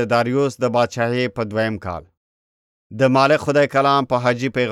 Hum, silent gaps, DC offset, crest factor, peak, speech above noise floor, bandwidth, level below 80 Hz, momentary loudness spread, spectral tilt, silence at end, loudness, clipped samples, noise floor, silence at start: none; 2.17-2.90 s; under 0.1%; 16 dB; -2 dBFS; over 72 dB; 13.5 kHz; -56 dBFS; 9 LU; -6 dB/octave; 0 s; -18 LUFS; under 0.1%; under -90 dBFS; 0 s